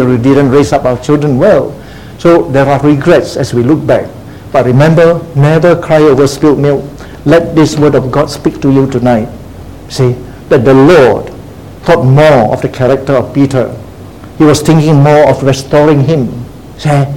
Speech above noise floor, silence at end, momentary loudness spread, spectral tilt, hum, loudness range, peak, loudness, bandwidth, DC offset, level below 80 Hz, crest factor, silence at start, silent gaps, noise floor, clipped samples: 21 dB; 0 s; 14 LU; -7 dB/octave; none; 2 LU; 0 dBFS; -8 LUFS; 16.5 kHz; 0.9%; -34 dBFS; 8 dB; 0 s; none; -28 dBFS; 2%